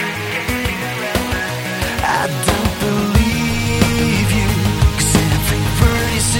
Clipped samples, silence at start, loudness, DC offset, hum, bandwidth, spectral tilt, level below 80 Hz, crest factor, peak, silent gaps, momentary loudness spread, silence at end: under 0.1%; 0 s; -16 LUFS; under 0.1%; none; 17 kHz; -4.5 dB/octave; -24 dBFS; 16 dB; 0 dBFS; none; 6 LU; 0 s